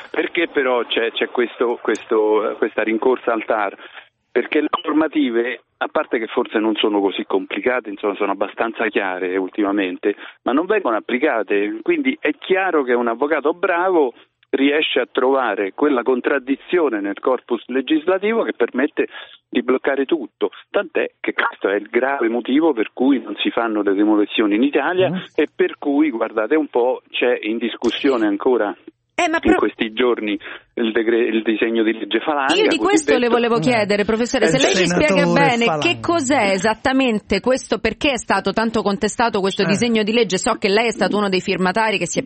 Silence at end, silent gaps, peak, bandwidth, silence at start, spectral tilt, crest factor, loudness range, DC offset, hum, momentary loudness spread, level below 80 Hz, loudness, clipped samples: 0 s; none; -2 dBFS; 8.8 kHz; 0 s; -4.5 dB/octave; 18 dB; 4 LU; under 0.1%; none; 6 LU; -52 dBFS; -19 LUFS; under 0.1%